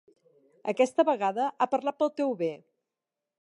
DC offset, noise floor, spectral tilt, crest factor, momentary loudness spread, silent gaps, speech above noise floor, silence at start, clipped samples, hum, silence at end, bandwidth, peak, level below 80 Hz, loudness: under 0.1%; -88 dBFS; -5 dB/octave; 20 dB; 10 LU; none; 61 dB; 0.65 s; under 0.1%; none; 0.85 s; 11.5 kHz; -10 dBFS; -84 dBFS; -28 LUFS